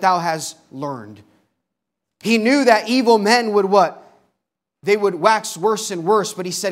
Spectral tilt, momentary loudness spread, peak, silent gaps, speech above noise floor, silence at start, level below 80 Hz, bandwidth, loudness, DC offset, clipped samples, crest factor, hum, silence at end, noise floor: -4 dB/octave; 14 LU; 0 dBFS; none; 63 dB; 0 s; -74 dBFS; 16 kHz; -17 LUFS; under 0.1%; under 0.1%; 18 dB; none; 0 s; -80 dBFS